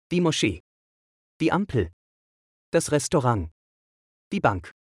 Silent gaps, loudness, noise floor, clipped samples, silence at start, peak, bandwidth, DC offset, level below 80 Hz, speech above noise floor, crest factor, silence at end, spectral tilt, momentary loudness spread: 0.60-1.40 s, 1.93-2.72 s, 3.51-4.31 s; -25 LUFS; under -90 dBFS; under 0.1%; 0.1 s; -8 dBFS; 12 kHz; under 0.1%; -52 dBFS; over 67 dB; 20 dB; 0.25 s; -5 dB/octave; 11 LU